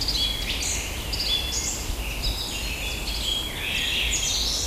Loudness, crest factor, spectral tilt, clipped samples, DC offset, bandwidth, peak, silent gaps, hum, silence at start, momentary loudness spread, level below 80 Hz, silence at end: -25 LUFS; 14 dB; -1.5 dB/octave; under 0.1%; under 0.1%; 16 kHz; -12 dBFS; none; none; 0 s; 6 LU; -34 dBFS; 0 s